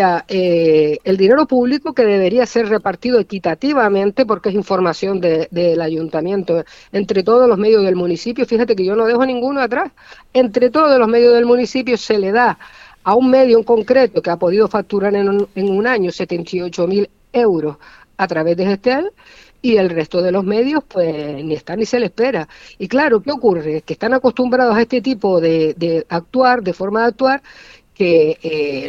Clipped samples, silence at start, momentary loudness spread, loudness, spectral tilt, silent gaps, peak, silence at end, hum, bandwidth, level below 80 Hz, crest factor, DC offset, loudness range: under 0.1%; 0 s; 9 LU; -15 LUFS; -6.5 dB/octave; none; 0 dBFS; 0 s; none; 7.6 kHz; -52 dBFS; 14 dB; under 0.1%; 4 LU